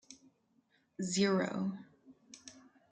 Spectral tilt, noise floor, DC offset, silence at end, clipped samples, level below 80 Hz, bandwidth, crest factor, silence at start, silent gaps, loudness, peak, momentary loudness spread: -4.5 dB/octave; -74 dBFS; under 0.1%; 0.35 s; under 0.1%; -78 dBFS; 9.6 kHz; 20 dB; 0.1 s; none; -34 LUFS; -18 dBFS; 25 LU